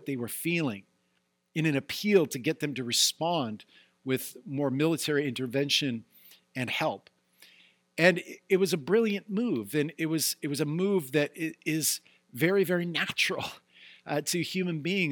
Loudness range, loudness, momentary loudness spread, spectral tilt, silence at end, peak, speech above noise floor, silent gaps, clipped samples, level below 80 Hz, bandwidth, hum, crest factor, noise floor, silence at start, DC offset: 2 LU; -29 LUFS; 11 LU; -4 dB/octave; 0 s; -6 dBFS; 46 dB; none; under 0.1%; -76 dBFS; 19 kHz; none; 22 dB; -75 dBFS; 0 s; under 0.1%